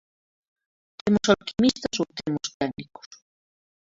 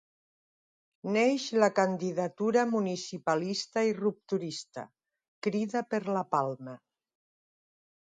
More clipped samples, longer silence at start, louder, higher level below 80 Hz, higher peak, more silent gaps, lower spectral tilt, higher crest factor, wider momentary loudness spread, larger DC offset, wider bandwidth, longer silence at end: neither; about the same, 1.05 s vs 1.05 s; first, -25 LUFS vs -30 LUFS; first, -56 dBFS vs -80 dBFS; first, -4 dBFS vs -10 dBFS; second, 2.54-2.60 s vs 5.28-5.42 s; about the same, -4.5 dB/octave vs -5 dB/octave; about the same, 24 dB vs 22 dB; second, 11 LU vs 14 LU; neither; second, 7.8 kHz vs 9.4 kHz; second, 1.15 s vs 1.35 s